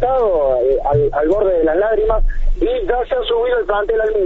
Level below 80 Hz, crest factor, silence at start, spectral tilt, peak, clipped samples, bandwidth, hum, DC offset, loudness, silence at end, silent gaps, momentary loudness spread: -22 dBFS; 12 dB; 0 s; -8 dB/octave; -4 dBFS; under 0.1%; 4.1 kHz; none; under 0.1%; -16 LUFS; 0 s; none; 4 LU